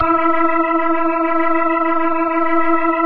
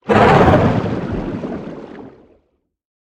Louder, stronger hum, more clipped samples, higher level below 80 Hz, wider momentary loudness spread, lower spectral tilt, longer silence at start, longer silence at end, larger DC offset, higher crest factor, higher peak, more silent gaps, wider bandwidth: about the same, -16 LUFS vs -14 LUFS; neither; neither; second, -48 dBFS vs -36 dBFS; second, 2 LU vs 22 LU; first, -10 dB/octave vs -7.5 dB/octave; about the same, 0 s vs 0.05 s; second, 0 s vs 0.95 s; neither; about the same, 12 dB vs 16 dB; second, -4 dBFS vs 0 dBFS; neither; second, 4.6 kHz vs 9.8 kHz